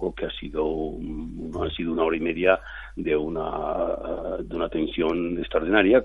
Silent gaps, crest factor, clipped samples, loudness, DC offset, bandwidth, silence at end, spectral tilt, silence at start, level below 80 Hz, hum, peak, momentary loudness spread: none; 20 dB; under 0.1%; -26 LUFS; under 0.1%; 6.6 kHz; 0 s; -8 dB/octave; 0 s; -42 dBFS; none; -6 dBFS; 10 LU